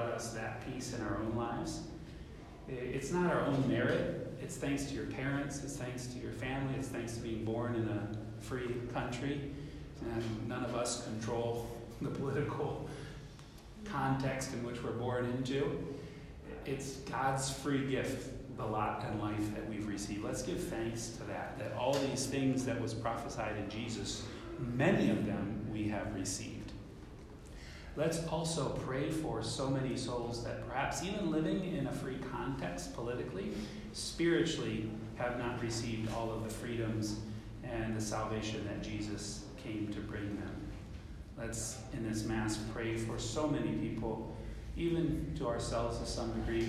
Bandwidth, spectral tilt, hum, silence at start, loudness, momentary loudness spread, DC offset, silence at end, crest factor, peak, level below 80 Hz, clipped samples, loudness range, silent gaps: 15 kHz; -5.5 dB/octave; none; 0 s; -38 LUFS; 11 LU; under 0.1%; 0 s; 20 dB; -18 dBFS; -52 dBFS; under 0.1%; 3 LU; none